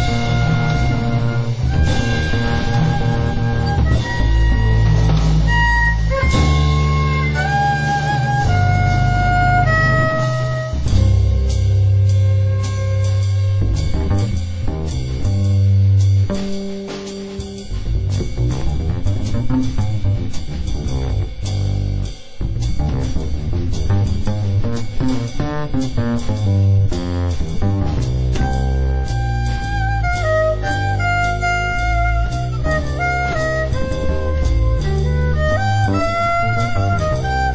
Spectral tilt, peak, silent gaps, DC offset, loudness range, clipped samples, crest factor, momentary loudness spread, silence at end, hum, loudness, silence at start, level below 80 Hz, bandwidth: -6.5 dB/octave; -2 dBFS; none; under 0.1%; 6 LU; under 0.1%; 14 dB; 8 LU; 0 s; none; -18 LUFS; 0 s; -22 dBFS; 8 kHz